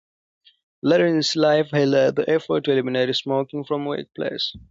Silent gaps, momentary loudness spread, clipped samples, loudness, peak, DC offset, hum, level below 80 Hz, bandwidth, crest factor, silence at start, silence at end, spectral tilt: none; 9 LU; under 0.1%; -21 LUFS; -6 dBFS; under 0.1%; none; -60 dBFS; 7.8 kHz; 16 dB; 0.85 s; 0.15 s; -5.5 dB/octave